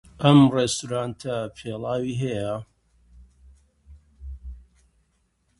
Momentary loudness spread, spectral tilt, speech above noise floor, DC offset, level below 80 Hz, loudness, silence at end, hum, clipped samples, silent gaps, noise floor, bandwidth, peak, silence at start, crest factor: 26 LU; -6 dB/octave; 47 dB; under 0.1%; -48 dBFS; -23 LUFS; 1 s; none; under 0.1%; none; -69 dBFS; 11.5 kHz; -2 dBFS; 0.2 s; 24 dB